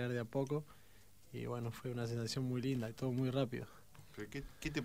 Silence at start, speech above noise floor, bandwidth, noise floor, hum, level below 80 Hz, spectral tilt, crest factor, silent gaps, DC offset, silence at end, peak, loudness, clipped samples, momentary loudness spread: 0 s; 25 dB; 16 kHz; -65 dBFS; none; -62 dBFS; -6.5 dB/octave; 16 dB; none; under 0.1%; 0 s; -24 dBFS; -41 LUFS; under 0.1%; 15 LU